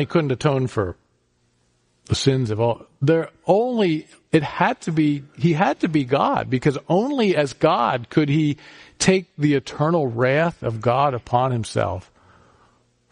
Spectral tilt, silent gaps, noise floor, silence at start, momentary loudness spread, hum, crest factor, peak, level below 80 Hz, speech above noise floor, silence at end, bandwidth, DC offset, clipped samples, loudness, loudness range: -6 dB/octave; none; -65 dBFS; 0 s; 5 LU; none; 18 dB; -4 dBFS; -52 dBFS; 45 dB; 1.1 s; 10.5 kHz; under 0.1%; under 0.1%; -21 LUFS; 3 LU